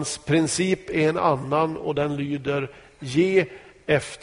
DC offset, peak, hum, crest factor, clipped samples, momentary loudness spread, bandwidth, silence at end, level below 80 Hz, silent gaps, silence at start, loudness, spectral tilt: under 0.1%; -6 dBFS; none; 16 dB; under 0.1%; 8 LU; 11 kHz; 0.05 s; -54 dBFS; none; 0 s; -23 LUFS; -5 dB/octave